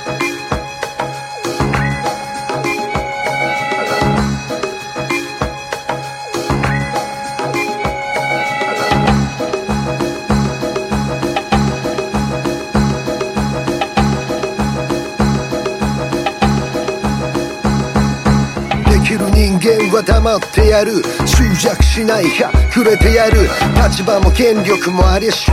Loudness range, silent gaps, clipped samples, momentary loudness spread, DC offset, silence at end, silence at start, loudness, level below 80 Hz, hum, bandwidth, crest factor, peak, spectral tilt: 6 LU; none; under 0.1%; 9 LU; under 0.1%; 0 s; 0 s; -15 LUFS; -20 dBFS; none; 15.5 kHz; 14 dB; 0 dBFS; -5.5 dB/octave